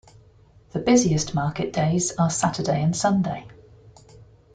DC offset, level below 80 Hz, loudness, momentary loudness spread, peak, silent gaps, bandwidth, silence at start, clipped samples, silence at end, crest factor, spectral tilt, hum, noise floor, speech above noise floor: under 0.1%; -52 dBFS; -22 LUFS; 9 LU; -6 dBFS; none; 9.4 kHz; 0.75 s; under 0.1%; 0.3 s; 18 dB; -5 dB/octave; none; -53 dBFS; 31 dB